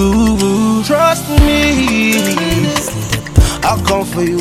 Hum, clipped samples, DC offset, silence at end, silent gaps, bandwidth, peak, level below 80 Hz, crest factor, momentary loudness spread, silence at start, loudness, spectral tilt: none; 0.2%; under 0.1%; 0 s; none; 16.5 kHz; 0 dBFS; -20 dBFS; 12 dB; 4 LU; 0 s; -13 LUFS; -5 dB/octave